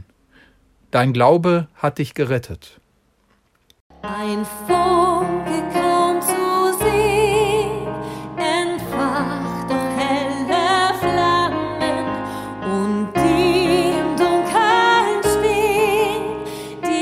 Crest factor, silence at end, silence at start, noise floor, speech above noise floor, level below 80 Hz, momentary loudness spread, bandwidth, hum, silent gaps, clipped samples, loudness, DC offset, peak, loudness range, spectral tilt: 18 dB; 0 s; 0.95 s; -61 dBFS; 42 dB; -44 dBFS; 11 LU; 16 kHz; none; 3.81-3.90 s; under 0.1%; -18 LUFS; under 0.1%; 0 dBFS; 5 LU; -5 dB/octave